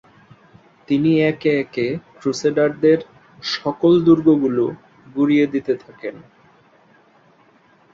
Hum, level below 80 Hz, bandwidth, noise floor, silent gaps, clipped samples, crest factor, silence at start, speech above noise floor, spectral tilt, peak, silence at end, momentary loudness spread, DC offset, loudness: none; -60 dBFS; 7.6 kHz; -54 dBFS; none; under 0.1%; 18 dB; 0.9 s; 36 dB; -6.5 dB/octave; -2 dBFS; 1.75 s; 14 LU; under 0.1%; -18 LUFS